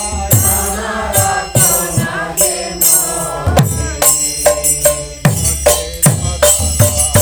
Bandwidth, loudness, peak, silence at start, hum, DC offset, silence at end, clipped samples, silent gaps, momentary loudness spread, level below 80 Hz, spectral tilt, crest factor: over 20 kHz; -12 LUFS; 0 dBFS; 0 s; none; under 0.1%; 0 s; 0.2%; none; 6 LU; -28 dBFS; -3 dB/octave; 14 dB